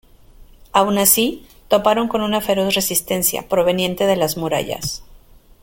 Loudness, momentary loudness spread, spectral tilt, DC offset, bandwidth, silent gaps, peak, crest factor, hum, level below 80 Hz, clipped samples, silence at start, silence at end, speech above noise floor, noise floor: -17 LUFS; 10 LU; -3 dB/octave; under 0.1%; 17 kHz; none; 0 dBFS; 20 dB; none; -46 dBFS; under 0.1%; 0.4 s; 0.5 s; 28 dB; -46 dBFS